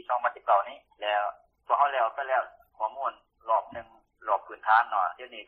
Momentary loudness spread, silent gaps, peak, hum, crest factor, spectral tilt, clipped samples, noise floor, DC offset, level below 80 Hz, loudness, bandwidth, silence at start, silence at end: 16 LU; none; -8 dBFS; none; 20 dB; -4.5 dB/octave; under 0.1%; -46 dBFS; under 0.1%; -74 dBFS; -28 LUFS; 4.7 kHz; 0.1 s; 0.05 s